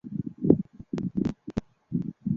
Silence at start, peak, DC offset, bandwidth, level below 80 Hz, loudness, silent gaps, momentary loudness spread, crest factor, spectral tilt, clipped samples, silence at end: 0.05 s; -2 dBFS; under 0.1%; 7.4 kHz; -52 dBFS; -30 LUFS; none; 12 LU; 26 dB; -10 dB/octave; under 0.1%; 0 s